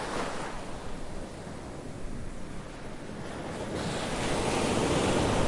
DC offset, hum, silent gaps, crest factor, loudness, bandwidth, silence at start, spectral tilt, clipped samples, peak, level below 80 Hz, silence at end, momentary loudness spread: under 0.1%; none; none; 18 dB; -33 LUFS; 11.5 kHz; 0 s; -4.5 dB/octave; under 0.1%; -14 dBFS; -42 dBFS; 0 s; 15 LU